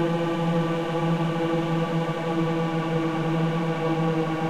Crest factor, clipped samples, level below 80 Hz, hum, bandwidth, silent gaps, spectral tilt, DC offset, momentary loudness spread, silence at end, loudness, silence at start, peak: 12 dB; under 0.1%; -54 dBFS; none; 9.8 kHz; none; -7.5 dB/octave; under 0.1%; 1 LU; 0 s; -25 LUFS; 0 s; -12 dBFS